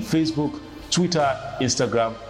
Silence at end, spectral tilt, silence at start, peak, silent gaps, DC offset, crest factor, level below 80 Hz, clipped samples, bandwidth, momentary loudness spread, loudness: 0 s; -4.5 dB/octave; 0 s; -10 dBFS; none; under 0.1%; 14 dB; -50 dBFS; under 0.1%; 15.5 kHz; 6 LU; -23 LUFS